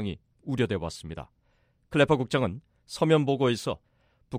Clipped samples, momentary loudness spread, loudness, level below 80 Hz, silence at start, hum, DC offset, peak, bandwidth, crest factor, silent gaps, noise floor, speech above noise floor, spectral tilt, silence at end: under 0.1%; 18 LU; -27 LUFS; -54 dBFS; 0 s; none; under 0.1%; -8 dBFS; 15 kHz; 20 dB; none; -68 dBFS; 41 dB; -6 dB/octave; 0 s